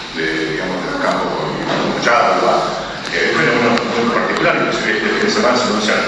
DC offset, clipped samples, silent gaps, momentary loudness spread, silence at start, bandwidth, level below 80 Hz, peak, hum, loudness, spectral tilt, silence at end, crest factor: under 0.1%; under 0.1%; none; 7 LU; 0 s; 11 kHz; -46 dBFS; 0 dBFS; none; -15 LUFS; -4 dB/octave; 0 s; 16 dB